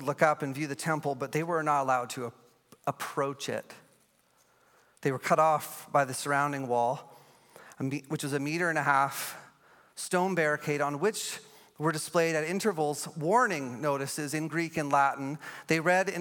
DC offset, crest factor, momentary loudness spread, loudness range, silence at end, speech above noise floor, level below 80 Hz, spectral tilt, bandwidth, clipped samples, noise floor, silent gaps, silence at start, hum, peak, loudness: under 0.1%; 22 dB; 11 LU; 3 LU; 0 s; 38 dB; -80 dBFS; -4.5 dB/octave; 17.5 kHz; under 0.1%; -67 dBFS; none; 0 s; none; -8 dBFS; -30 LUFS